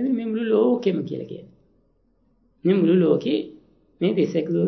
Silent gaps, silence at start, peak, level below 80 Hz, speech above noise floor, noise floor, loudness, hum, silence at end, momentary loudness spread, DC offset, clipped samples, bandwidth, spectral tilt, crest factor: none; 0 s; -6 dBFS; -68 dBFS; 44 dB; -64 dBFS; -22 LUFS; none; 0 s; 15 LU; under 0.1%; under 0.1%; 6.2 kHz; -8.5 dB/octave; 16 dB